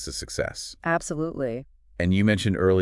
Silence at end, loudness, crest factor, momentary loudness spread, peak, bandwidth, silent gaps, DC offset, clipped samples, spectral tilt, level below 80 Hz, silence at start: 0 s; -26 LUFS; 18 dB; 10 LU; -8 dBFS; 12 kHz; none; under 0.1%; under 0.1%; -5.5 dB/octave; -48 dBFS; 0 s